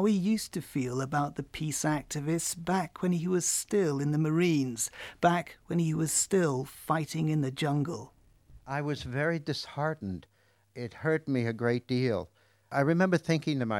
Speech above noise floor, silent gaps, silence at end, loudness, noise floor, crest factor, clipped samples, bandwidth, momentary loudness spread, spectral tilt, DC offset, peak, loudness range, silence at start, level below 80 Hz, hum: 27 dB; none; 0 s; -30 LUFS; -57 dBFS; 20 dB; under 0.1%; 16 kHz; 9 LU; -5 dB/octave; under 0.1%; -10 dBFS; 5 LU; 0 s; -60 dBFS; none